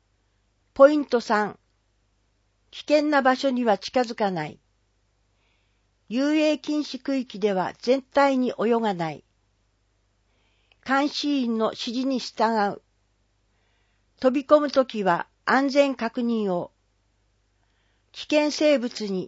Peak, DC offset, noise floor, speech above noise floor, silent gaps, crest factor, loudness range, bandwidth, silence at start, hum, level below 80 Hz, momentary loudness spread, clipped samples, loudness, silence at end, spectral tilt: -2 dBFS; under 0.1%; -68 dBFS; 45 dB; none; 22 dB; 4 LU; 8 kHz; 0.75 s; none; -68 dBFS; 12 LU; under 0.1%; -23 LUFS; 0 s; -5 dB/octave